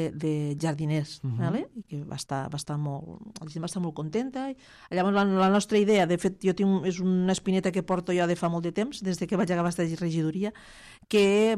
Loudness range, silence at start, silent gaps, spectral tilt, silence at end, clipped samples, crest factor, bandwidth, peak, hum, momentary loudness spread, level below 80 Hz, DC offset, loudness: 8 LU; 0 s; none; -6 dB/octave; 0 s; under 0.1%; 16 dB; 12.5 kHz; -12 dBFS; none; 13 LU; -60 dBFS; under 0.1%; -27 LUFS